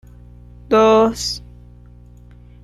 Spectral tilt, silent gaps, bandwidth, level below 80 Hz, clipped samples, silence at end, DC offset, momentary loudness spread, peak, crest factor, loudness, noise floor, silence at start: -4.5 dB/octave; none; 14 kHz; -42 dBFS; under 0.1%; 1.25 s; under 0.1%; 13 LU; -4 dBFS; 16 dB; -15 LUFS; -42 dBFS; 0.7 s